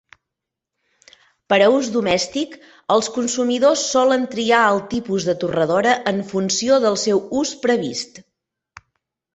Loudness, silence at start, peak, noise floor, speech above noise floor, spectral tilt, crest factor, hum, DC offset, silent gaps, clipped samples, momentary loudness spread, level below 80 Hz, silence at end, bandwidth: -18 LUFS; 1.5 s; -2 dBFS; -83 dBFS; 65 dB; -3.5 dB/octave; 18 dB; none; under 0.1%; none; under 0.1%; 8 LU; -58 dBFS; 1.15 s; 8.4 kHz